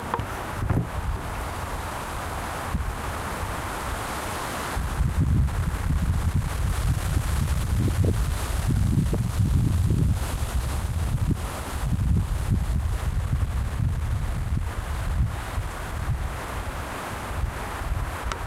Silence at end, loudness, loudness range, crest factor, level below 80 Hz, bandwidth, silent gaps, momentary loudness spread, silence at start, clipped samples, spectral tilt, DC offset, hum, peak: 0 s; -27 LUFS; 6 LU; 14 dB; -30 dBFS; 16 kHz; none; 8 LU; 0 s; under 0.1%; -6 dB/octave; under 0.1%; none; -12 dBFS